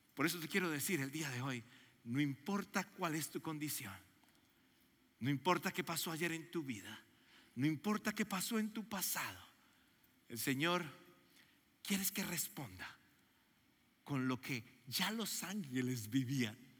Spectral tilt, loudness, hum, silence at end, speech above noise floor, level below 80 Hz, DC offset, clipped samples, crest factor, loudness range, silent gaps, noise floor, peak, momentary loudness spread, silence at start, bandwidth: -4 dB/octave; -40 LUFS; none; 0.1 s; 33 dB; -84 dBFS; under 0.1%; under 0.1%; 22 dB; 3 LU; none; -74 dBFS; -20 dBFS; 12 LU; 0.15 s; 17 kHz